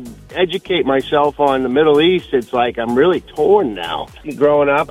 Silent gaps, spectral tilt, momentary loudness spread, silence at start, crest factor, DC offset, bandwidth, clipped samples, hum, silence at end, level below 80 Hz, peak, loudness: none; -6 dB/octave; 9 LU; 0 s; 14 dB; under 0.1%; 13.5 kHz; under 0.1%; none; 0 s; -44 dBFS; -2 dBFS; -15 LUFS